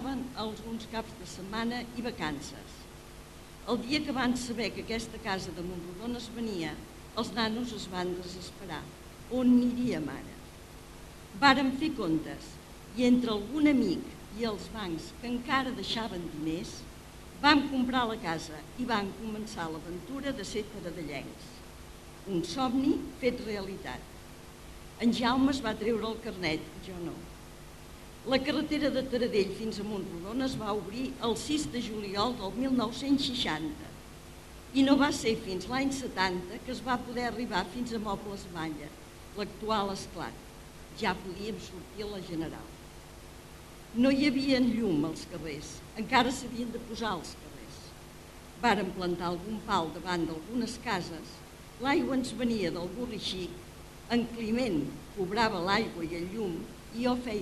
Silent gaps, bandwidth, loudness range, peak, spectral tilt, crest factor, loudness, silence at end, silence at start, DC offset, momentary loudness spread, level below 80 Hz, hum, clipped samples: none; 14 kHz; 7 LU; -6 dBFS; -4.5 dB/octave; 26 dB; -32 LUFS; 0 s; 0 s; under 0.1%; 21 LU; -52 dBFS; none; under 0.1%